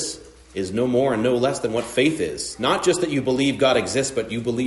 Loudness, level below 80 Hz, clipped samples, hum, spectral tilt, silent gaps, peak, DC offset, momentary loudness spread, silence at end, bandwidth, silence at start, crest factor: -21 LUFS; -52 dBFS; under 0.1%; none; -4.5 dB/octave; none; -6 dBFS; under 0.1%; 8 LU; 0 s; 11.5 kHz; 0 s; 16 dB